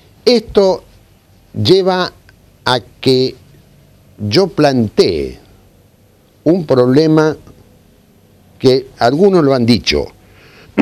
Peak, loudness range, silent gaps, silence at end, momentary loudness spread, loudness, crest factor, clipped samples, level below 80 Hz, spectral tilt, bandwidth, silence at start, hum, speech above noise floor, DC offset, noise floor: 0 dBFS; 3 LU; none; 0 s; 12 LU; -13 LUFS; 14 dB; under 0.1%; -42 dBFS; -6 dB/octave; 14 kHz; 0.25 s; none; 37 dB; under 0.1%; -49 dBFS